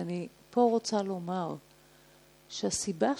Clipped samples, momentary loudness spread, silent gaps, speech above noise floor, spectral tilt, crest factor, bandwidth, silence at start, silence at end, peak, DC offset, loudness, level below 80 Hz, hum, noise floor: under 0.1%; 12 LU; none; 29 dB; -4.5 dB/octave; 20 dB; 19.5 kHz; 0 s; 0 s; -12 dBFS; under 0.1%; -32 LUFS; -68 dBFS; none; -60 dBFS